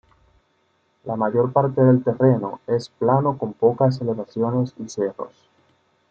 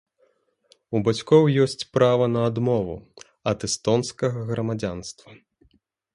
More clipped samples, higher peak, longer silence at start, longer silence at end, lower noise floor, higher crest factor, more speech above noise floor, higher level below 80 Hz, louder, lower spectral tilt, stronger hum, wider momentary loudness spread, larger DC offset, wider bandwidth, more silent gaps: neither; about the same, -4 dBFS vs -4 dBFS; first, 1.05 s vs 0.9 s; about the same, 0.85 s vs 0.8 s; about the same, -65 dBFS vs -66 dBFS; about the same, 18 dB vs 20 dB; about the same, 45 dB vs 43 dB; second, -62 dBFS vs -54 dBFS; about the same, -21 LUFS vs -23 LUFS; first, -8.5 dB/octave vs -6 dB/octave; neither; second, 10 LU vs 13 LU; neither; second, 7.4 kHz vs 11.5 kHz; neither